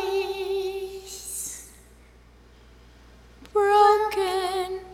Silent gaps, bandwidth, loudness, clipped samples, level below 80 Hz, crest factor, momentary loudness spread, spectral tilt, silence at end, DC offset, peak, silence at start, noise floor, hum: none; 16.5 kHz; -24 LUFS; under 0.1%; -54 dBFS; 20 dB; 17 LU; -2.5 dB/octave; 0 s; under 0.1%; -6 dBFS; 0 s; -52 dBFS; none